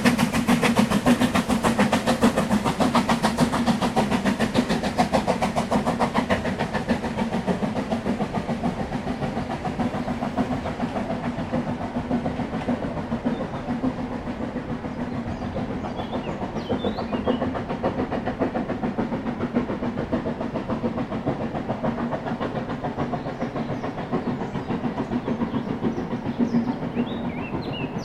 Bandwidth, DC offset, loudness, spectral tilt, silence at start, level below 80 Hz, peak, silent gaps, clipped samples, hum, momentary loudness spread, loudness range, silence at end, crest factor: 14.5 kHz; under 0.1%; -25 LUFS; -6 dB/octave; 0 s; -44 dBFS; -4 dBFS; none; under 0.1%; none; 8 LU; 7 LU; 0 s; 20 dB